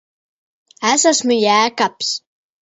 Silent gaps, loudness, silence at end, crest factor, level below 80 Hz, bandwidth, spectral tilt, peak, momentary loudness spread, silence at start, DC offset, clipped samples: none; -15 LUFS; 0.45 s; 18 dB; -66 dBFS; 8 kHz; -1.5 dB/octave; 0 dBFS; 8 LU; 0.8 s; under 0.1%; under 0.1%